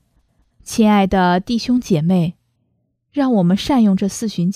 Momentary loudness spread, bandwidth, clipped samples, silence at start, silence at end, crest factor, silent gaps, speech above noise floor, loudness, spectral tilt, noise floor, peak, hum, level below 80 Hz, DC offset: 7 LU; 14.5 kHz; under 0.1%; 0.65 s; 0 s; 14 dB; none; 51 dB; -16 LUFS; -6.5 dB/octave; -67 dBFS; -2 dBFS; none; -44 dBFS; under 0.1%